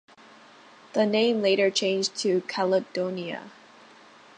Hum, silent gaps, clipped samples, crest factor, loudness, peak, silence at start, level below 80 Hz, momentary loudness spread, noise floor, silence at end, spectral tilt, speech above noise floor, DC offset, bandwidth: none; none; under 0.1%; 16 dB; -25 LUFS; -10 dBFS; 0.95 s; -80 dBFS; 10 LU; -52 dBFS; 0.9 s; -4 dB/octave; 27 dB; under 0.1%; 10 kHz